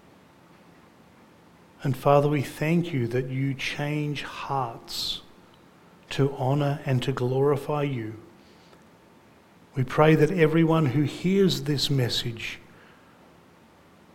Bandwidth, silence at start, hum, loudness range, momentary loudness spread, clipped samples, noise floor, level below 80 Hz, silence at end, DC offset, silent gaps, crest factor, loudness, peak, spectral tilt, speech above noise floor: 16.5 kHz; 1.8 s; none; 6 LU; 13 LU; under 0.1%; -55 dBFS; -54 dBFS; 1.55 s; under 0.1%; none; 22 dB; -25 LUFS; -6 dBFS; -6.5 dB/octave; 31 dB